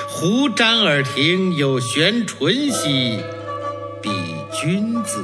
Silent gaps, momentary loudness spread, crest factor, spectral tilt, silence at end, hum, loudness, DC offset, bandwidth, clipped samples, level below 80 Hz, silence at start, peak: none; 12 LU; 18 dB; -4 dB/octave; 0 s; none; -18 LUFS; under 0.1%; 11 kHz; under 0.1%; -64 dBFS; 0 s; -2 dBFS